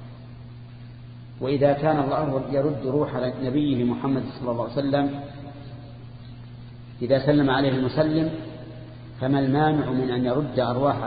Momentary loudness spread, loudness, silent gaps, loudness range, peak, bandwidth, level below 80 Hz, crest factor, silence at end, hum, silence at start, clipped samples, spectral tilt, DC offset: 21 LU; -24 LUFS; none; 4 LU; -6 dBFS; 5 kHz; -50 dBFS; 18 dB; 0 s; none; 0 s; under 0.1%; -12 dB/octave; under 0.1%